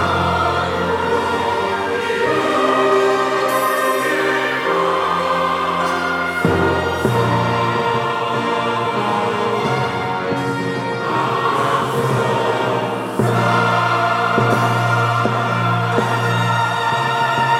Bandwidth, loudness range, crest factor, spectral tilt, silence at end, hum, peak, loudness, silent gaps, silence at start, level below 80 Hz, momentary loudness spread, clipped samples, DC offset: 16 kHz; 2 LU; 14 dB; -5.5 dB/octave; 0 s; none; -2 dBFS; -17 LUFS; none; 0 s; -54 dBFS; 4 LU; under 0.1%; under 0.1%